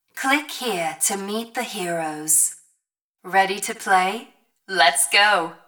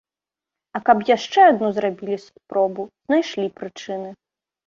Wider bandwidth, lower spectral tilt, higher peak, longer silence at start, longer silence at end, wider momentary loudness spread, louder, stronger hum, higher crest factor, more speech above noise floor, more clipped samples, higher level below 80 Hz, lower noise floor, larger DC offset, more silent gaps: first, over 20 kHz vs 7.4 kHz; second, -1 dB/octave vs -5 dB/octave; about the same, -2 dBFS vs -2 dBFS; second, 0.15 s vs 0.75 s; second, 0.1 s vs 0.55 s; second, 11 LU vs 17 LU; about the same, -20 LUFS vs -20 LUFS; neither; about the same, 20 dB vs 20 dB; second, 55 dB vs 69 dB; neither; second, -78 dBFS vs -68 dBFS; second, -76 dBFS vs -89 dBFS; neither; first, 3.02-3.13 s vs none